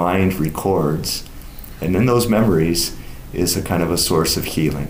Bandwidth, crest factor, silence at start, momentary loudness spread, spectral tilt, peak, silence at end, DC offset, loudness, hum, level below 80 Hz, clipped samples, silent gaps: 16 kHz; 12 dB; 0 s; 13 LU; -5 dB/octave; -6 dBFS; 0 s; under 0.1%; -18 LUFS; none; -34 dBFS; under 0.1%; none